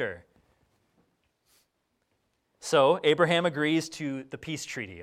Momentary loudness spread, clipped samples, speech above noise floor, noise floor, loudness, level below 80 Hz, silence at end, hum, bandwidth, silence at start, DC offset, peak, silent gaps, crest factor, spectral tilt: 15 LU; under 0.1%; 50 dB; -76 dBFS; -27 LUFS; -70 dBFS; 0 s; none; 14.5 kHz; 0 s; under 0.1%; -10 dBFS; none; 20 dB; -4.5 dB/octave